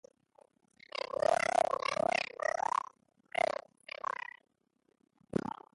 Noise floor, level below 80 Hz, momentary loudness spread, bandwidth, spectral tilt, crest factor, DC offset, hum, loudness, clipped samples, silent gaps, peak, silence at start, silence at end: -77 dBFS; -72 dBFS; 13 LU; 11.5 kHz; -3.5 dB/octave; 20 dB; under 0.1%; none; -34 LUFS; under 0.1%; none; -16 dBFS; 1 s; 0.2 s